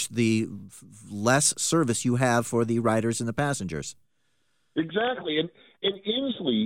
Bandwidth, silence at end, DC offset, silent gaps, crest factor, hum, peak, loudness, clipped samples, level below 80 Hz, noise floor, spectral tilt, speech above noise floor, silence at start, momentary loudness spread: 16.5 kHz; 0 s; under 0.1%; none; 18 dB; none; -8 dBFS; -26 LUFS; under 0.1%; -60 dBFS; -74 dBFS; -4 dB/octave; 48 dB; 0 s; 13 LU